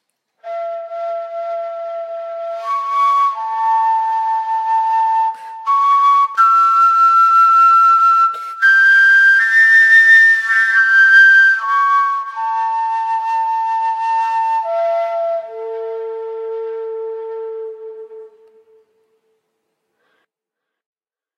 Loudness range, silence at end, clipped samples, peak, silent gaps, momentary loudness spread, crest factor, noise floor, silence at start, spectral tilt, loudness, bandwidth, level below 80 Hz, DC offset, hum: 18 LU; 3.1 s; under 0.1%; 0 dBFS; none; 18 LU; 14 dB; -81 dBFS; 0.45 s; 3 dB/octave; -11 LUFS; 15.5 kHz; under -90 dBFS; under 0.1%; none